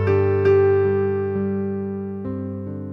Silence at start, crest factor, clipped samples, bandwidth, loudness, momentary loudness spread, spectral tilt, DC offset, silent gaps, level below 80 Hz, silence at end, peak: 0 s; 14 dB; under 0.1%; 5.6 kHz; -21 LUFS; 12 LU; -10.5 dB/octave; under 0.1%; none; -58 dBFS; 0 s; -6 dBFS